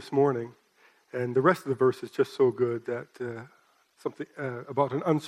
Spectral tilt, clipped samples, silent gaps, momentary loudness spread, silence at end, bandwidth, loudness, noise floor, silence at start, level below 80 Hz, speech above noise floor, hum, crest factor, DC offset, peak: -7.5 dB/octave; under 0.1%; none; 13 LU; 0 s; 14 kHz; -28 LUFS; -63 dBFS; 0 s; -76 dBFS; 35 dB; none; 20 dB; under 0.1%; -8 dBFS